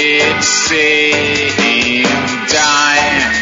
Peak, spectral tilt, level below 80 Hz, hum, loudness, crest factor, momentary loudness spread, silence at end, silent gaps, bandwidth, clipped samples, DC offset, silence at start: 0 dBFS; -1.5 dB/octave; -44 dBFS; none; -10 LUFS; 12 dB; 3 LU; 0 s; none; 10.5 kHz; under 0.1%; under 0.1%; 0 s